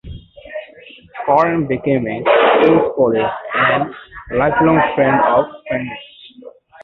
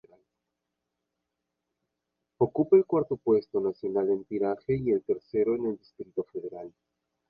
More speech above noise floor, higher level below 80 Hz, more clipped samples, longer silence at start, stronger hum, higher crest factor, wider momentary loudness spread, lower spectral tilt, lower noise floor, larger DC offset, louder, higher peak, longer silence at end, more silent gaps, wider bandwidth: second, 27 dB vs 57 dB; first, -46 dBFS vs -64 dBFS; neither; second, 0.05 s vs 2.4 s; neither; about the same, 16 dB vs 20 dB; first, 19 LU vs 16 LU; second, -8.5 dB/octave vs -11.5 dB/octave; second, -41 dBFS vs -84 dBFS; neither; first, -15 LUFS vs -28 LUFS; first, 0 dBFS vs -10 dBFS; second, 0.35 s vs 0.6 s; neither; about the same, 5.8 kHz vs 5.4 kHz